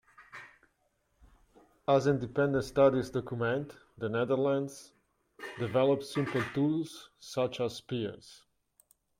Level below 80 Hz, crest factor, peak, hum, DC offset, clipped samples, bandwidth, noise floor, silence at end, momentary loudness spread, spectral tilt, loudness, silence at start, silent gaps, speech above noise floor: -64 dBFS; 20 dB; -12 dBFS; none; under 0.1%; under 0.1%; 15.5 kHz; -75 dBFS; 0.85 s; 20 LU; -6.5 dB/octave; -31 LUFS; 0.2 s; none; 45 dB